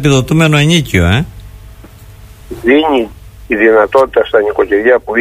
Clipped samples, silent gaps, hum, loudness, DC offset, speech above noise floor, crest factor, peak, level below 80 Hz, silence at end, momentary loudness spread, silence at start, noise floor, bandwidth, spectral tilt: under 0.1%; none; none; -10 LUFS; under 0.1%; 25 dB; 12 dB; 0 dBFS; -32 dBFS; 0 s; 9 LU; 0 s; -34 dBFS; 15.5 kHz; -5.5 dB/octave